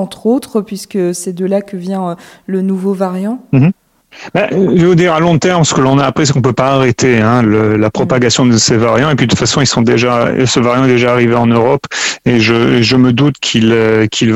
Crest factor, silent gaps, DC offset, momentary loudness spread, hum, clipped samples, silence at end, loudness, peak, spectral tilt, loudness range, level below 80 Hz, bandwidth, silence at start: 10 dB; none; under 0.1%; 8 LU; none; under 0.1%; 0 s; -11 LUFS; 0 dBFS; -5 dB/octave; 6 LU; -42 dBFS; 14.5 kHz; 0 s